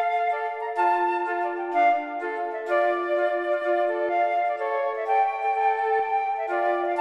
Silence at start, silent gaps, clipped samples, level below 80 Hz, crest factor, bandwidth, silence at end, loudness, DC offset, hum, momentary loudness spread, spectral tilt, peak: 0 s; none; under 0.1%; -78 dBFS; 14 dB; 8.6 kHz; 0 s; -25 LUFS; under 0.1%; none; 5 LU; -3.5 dB/octave; -10 dBFS